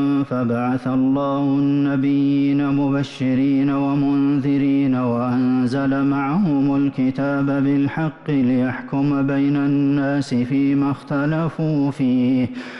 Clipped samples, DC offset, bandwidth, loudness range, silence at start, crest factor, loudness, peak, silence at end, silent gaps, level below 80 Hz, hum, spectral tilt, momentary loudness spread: under 0.1%; under 0.1%; 6.4 kHz; 1 LU; 0 s; 6 dB; -19 LUFS; -12 dBFS; 0 s; none; -52 dBFS; none; -8.5 dB/octave; 3 LU